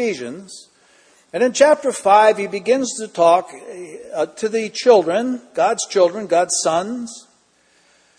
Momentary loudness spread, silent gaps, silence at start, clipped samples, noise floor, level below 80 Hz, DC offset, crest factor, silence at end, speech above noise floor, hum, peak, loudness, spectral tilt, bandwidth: 19 LU; none; 0 s; under 0.1%; -58 dBFS; -70 dBFS; under 0.1%; 18 dB; 1 s; 40 dB; none; 0 dBFS; -17 LUFS; -3 dB/octave; 10.5 kHz